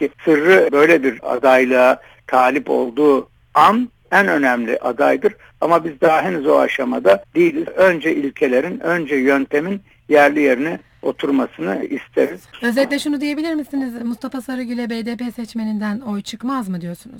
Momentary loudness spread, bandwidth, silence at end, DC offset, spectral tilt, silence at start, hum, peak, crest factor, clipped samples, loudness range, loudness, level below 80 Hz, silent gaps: 12 LU; 19 kHz; 0 s; under 0.1%; -5.5 dB/octave; 0 s; none; 0 dBFS; 16 dB; under 0.1%; 7 LU; -17 LUFS; -58 dBFS; none